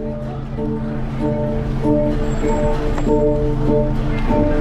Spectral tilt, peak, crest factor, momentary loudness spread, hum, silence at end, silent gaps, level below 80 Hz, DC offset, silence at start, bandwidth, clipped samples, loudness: -8.5 dB/octave; -4 dBFS; 12 dB; 7 LU; none; 0 s; none; -22 dBFS; under 0.1%; 0 s; 8 kHz; under 0.1%; -20 LUFS